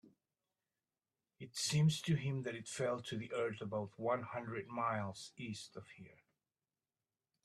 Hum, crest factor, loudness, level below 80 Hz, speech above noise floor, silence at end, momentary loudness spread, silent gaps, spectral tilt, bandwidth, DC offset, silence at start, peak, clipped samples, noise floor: none; 18 dB; -40 LUFS; -76 dBFS; over 50 dB; 1.3 s; 16 LU; none; -5 dB/octave; 13.5 kHz; under 0.1%; 0.05 s; -24 dBFS; under 0.1%; under -90 dBFS